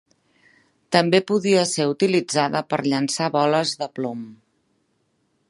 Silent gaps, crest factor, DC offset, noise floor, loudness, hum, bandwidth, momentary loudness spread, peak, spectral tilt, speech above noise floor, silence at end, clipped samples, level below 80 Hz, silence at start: none; 20 dB; under 0.1%; -68 dBFS; -21 LUFS; none; 11.5 kHz; 10 LU; -2 dBFS; -4.5 dB/octave; 48 dB; 1.15 s; under 0.1%; -70 dBFS; 0.9 s